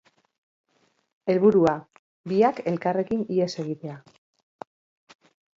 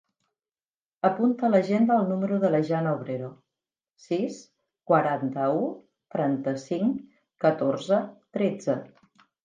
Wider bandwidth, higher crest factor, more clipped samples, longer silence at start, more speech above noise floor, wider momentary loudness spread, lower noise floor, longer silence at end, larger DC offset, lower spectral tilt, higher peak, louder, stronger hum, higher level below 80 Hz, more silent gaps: second, 7.6 kHz vs 9.2 kHz; about the same, 20 dB vs 20 dB; neither; first, 1.25 s vs 1.05 s; second, 45 dB vs over 65 dB; first, 26 LU vs 12 LU; second, -68 dBFS vs under -90 dBFS; first, 1.6 s vs 0.6 s; neither; about the same, -7.5 dB/octave vs -7.5 dB/octave; about the same, -8 dBFS vs -8 dBFS; about the same, -24 LUFS vs -26 LUFS; neither; first, -66 dBFS vs -76 dBFS; first, 1.99-2.24 s vs none